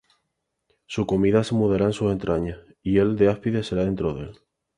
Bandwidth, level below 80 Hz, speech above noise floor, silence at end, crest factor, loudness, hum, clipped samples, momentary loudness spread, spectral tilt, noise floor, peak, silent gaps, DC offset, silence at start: 11 kHz; -46 dBFS; 56 dB; 0.45 s; 18 dB; -23 LUFS; none; under 0.1%; 13 LU; -7.5 dB/octave; -78 dBFS; -6 dBFS; none; under 0.1%; 0.9 s